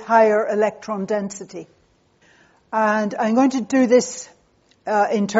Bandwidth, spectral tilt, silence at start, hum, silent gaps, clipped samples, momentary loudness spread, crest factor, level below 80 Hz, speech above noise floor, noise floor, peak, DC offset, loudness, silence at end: 8 kHz; -4.5 dB/octave; 0 s; none; none; under 0.1%; 18 LU; 18 dB; -68 dBFS; 40 dB; -59 dBFS; -2 dBFS; under 0.1%; -19 LUFS; 0 s